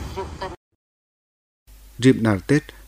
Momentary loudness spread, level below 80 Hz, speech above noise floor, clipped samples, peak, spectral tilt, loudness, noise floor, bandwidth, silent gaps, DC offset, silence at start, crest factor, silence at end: 16 LU; -44 dBFS; over 70 dB; under 0.1%; -2 dBFS; -6.5 dB/octave; -21 LUFS; under -90 dBFS; 15.5 kHz; 0.57-1.66 s; under 0.1%; 0 s; 22 dB; 0.05 s